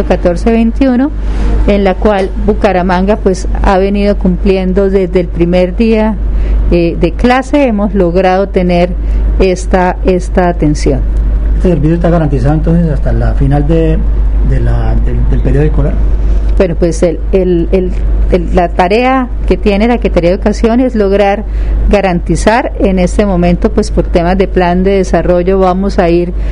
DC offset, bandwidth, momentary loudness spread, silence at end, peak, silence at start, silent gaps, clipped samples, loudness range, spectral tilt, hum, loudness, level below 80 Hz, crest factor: 0.2%; 10.5 kHz; 4 LU; 0 s; 0 dBFS; 0 s; none; 0.6%; 2 LU; -7.5 dB/octave; none; -10 LUFS; -12 dBFS; 8 dB